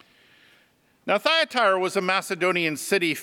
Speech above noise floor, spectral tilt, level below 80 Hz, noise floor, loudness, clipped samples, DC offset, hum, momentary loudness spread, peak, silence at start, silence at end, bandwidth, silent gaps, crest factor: 39 dB; -3 dB/octave; -80 dBFS; -62 dBFS; -22 LUFS; under 0.1%; under 0.1%; none; 4 LU; -4 dBFS; 1.05 s; 0 s; 18 kHz; none; 20 dB